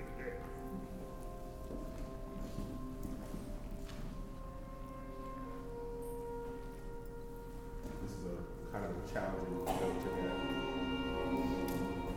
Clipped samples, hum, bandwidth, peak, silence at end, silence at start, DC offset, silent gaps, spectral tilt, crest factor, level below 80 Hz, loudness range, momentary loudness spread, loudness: under 0.1%; none; 18.5 kHz; -24 dBFS; 0 s; 0 s; under 0.1%; none; -6 dB/octave; 18 dB; -48 dBFS; 9 LU; 12 LU; -43 LUFS